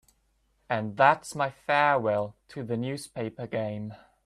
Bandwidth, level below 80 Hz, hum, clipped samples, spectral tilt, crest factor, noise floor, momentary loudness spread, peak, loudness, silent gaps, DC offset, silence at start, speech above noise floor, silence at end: 14 kHz; -66 dBFS; none; under 0.1%; -5.5 dB/octave; 24 dB; -70 dBFS; 14 LU; -6 dBFS; -28 LUFS; none; under 0.1%; 0.7 s; 43 dB; 0.3 s